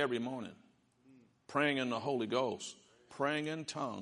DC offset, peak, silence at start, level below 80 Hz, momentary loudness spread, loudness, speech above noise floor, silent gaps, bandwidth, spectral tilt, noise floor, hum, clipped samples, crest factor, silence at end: under 0.1%; -18 dBFS; 0 s; -82 dBFS; 15 LU; -37 LUFS; 30 dB; none; 11.5 kHz; -4.5 dB/octave; -67 dBFS; none; under 0.1%; 20 dB; 0 s